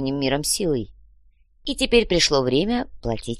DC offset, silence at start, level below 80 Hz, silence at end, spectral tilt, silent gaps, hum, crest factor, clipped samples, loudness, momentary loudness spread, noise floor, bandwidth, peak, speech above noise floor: 0.3%; 0 s; -38 dBFS; 0 s; -3.5 dB/octave; none; none; 20 dB; under 0.1%; -21 LUFS; 12 LU; -56 dBFS; 13 kHz; -2 dBFS; 35 dB